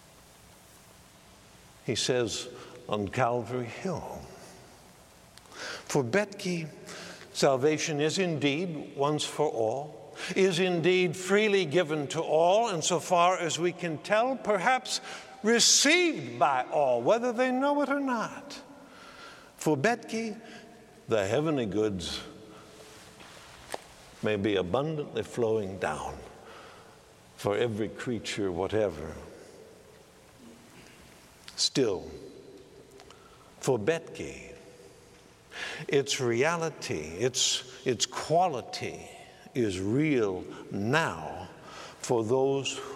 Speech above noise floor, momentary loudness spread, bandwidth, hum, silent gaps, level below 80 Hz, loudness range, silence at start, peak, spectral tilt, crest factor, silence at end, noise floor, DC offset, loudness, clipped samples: 27 dB; 21 LU; 15.5 kHz; none; none; -64 dBFS; 10 LU; 1.85 s; -8 dBFS; -3.5 dB/octave; 22 dB; 0 s; -55 dBFS; under 0.1%; -28 LUFS; under 0.1%